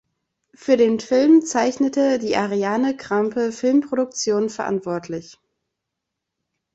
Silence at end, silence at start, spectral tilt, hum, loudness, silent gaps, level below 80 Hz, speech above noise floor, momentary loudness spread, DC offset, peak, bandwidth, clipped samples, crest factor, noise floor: 1.45 s; 0.6 s; -4.5 dB/octave; none; -20 LUFS; none; -64 dBFS; 62 dB; 10 LU; under 0.1%; -4 dBFS; 8.2 kHz; under 0.1%; 16 dB; -81 dBFS